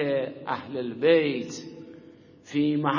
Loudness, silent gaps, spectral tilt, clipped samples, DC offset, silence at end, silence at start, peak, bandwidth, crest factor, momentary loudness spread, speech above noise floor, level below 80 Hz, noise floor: -26 LUFS; none; -6 dB/octave; under 0.1%; under 0.1%; 0 s; 0 s; -8 dBFS; 7.4 kHz; 18 dB; 21 LU; 25 dB; -70 dBFS; -50 dBFS